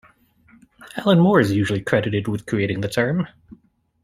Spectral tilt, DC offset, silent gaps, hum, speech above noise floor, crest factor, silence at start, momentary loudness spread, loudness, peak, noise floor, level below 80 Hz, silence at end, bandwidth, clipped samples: -7 dB/octave; under 0.1%; none; none; 36 dB; 20 dB; 0.8 s; 10 LU; -20 LUFS; -2 dBFS; -55 dBFS; -54 dBFS; 0.75 s; 15 kHz; under 0.1%